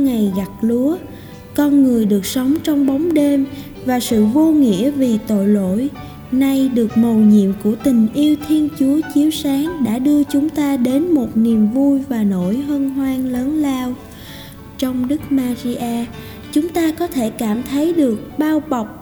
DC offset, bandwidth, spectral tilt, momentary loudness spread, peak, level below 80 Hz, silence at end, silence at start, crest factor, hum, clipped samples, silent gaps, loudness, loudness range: under 0.1%; over 20 kHz; -6.5 dB/octave; 10 LU; -2 dBFS; -44 dBFS; 0 s; 0 s; 14 dB; none; under 0.1%; none; -16 LUFS; 5 LU